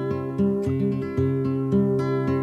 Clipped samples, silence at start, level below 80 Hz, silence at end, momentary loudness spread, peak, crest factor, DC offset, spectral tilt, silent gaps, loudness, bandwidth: under 0.1%; 0 s; -52 dBFS; 0 s; 3 LU; -10 dBFS; 12 dB; under 0.1%; -10 dB/octave; none; -24 LUFS; 8 kHz